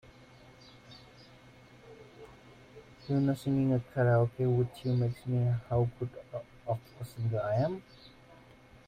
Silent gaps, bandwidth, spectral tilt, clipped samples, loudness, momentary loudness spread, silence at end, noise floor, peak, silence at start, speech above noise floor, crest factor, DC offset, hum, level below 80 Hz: none; 9.8 kHz; -9 dB/octave; under 0.1%; -32 LUFS; 24 LU; 0.8 s; -57 dBFS; -16 dBFS; 0.9 s; 26 dB; 18 dB; under 0.1%; none; -60 dBFS